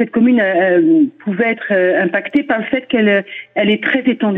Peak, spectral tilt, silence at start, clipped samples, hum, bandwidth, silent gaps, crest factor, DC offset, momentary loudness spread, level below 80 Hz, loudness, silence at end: -4 dBFS; -8.5 dB/octave; 0 s; under 0.1%; none; 4 kHz; none; 10 dB; under 0.1%; 6 LU; -58 dBFS; -14 LUFS; 0 s